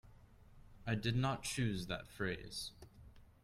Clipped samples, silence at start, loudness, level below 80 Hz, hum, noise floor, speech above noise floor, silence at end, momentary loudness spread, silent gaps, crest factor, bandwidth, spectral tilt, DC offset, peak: under 0.1%; 0.05 s; -40 LUFS; -58 dBFS; none; -61 dBFS; 22 dB; 0.2 s; 13 LU; none; 20 dB; 15 kHz; -5 dB/octave; under 0.1%; -22 dBFS